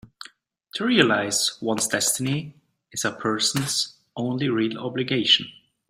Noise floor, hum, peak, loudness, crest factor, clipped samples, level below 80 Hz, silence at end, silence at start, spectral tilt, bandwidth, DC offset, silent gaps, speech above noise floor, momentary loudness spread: -52 dBFS; none; -2 dBFS; -23 LUFS; 22 dB; under 0.1%; -64 dBFS; 0.4 s; 0.75 s; -3 dB/octave; 16 kHz; under 0.1%; none; 28 dB; 16 LU